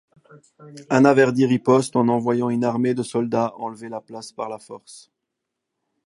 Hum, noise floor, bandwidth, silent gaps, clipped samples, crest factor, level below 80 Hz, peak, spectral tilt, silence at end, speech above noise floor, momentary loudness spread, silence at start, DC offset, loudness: none; -81 dBFS; 11.5 kHz; none; under 0.1%; 20 dB; -68 dBFS; 0 dBFS; -6.5 dB/octave; 1.1 s; 60 dB; 18 LU; 0.6 s; under 0.1%; -20 LUFS